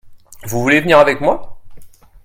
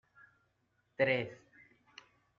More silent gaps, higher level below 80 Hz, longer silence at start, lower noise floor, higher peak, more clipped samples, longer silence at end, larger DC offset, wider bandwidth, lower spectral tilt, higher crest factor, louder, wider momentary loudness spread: neither; first, -42 dBFS vs -78 dBFS; second, 0.05 s vs 1 s; second, -34 dBFS vs -78 dBFS; first, 0 dBFS vs -16 dBFS; neither; second, 0.35 s vs 1.05 s; neither; first, 16.5 kHz vs 7 kHz; first, -5 dB/octave vs -3.5 dB/octave; second, 16 dB vs 24 dB; first, -13 LUFS vs -34 LUFS; second, 14 LU vs 26 LU